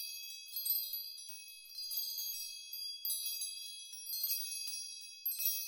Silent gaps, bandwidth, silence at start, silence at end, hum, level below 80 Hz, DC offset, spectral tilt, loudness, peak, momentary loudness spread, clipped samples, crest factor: none; 17 kHz; 0 s; 0 s; none; under -90 dBFS; under 0.1%; 7.5 dB/octave; -38 LUFS; -22 dBFS; 10 LU; under 0.1%; 20 dB